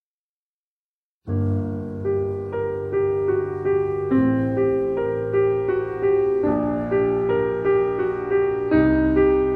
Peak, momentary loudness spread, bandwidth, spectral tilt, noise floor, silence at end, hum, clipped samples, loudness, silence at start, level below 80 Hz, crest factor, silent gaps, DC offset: -6 dBFS; 7 LU; 4.3 kHz; -10.5 dB/octave; under -90 dBFS; 0 s; none; under 0.1%; -22 LUFS; 1.25 s; -42 dBFS; 14 dB; none; under 0.1%